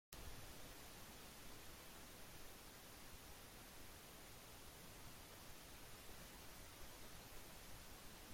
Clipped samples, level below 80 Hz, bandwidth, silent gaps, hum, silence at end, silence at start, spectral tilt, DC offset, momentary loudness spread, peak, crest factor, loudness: under 0.1%; -66 dBFS; 16.5 kHz; none; none; 0 s; 0.1 s; -2.5 dB/octave; under 0.1%; 1 LU; -30 dBFS; 28 dB; -58 LUFS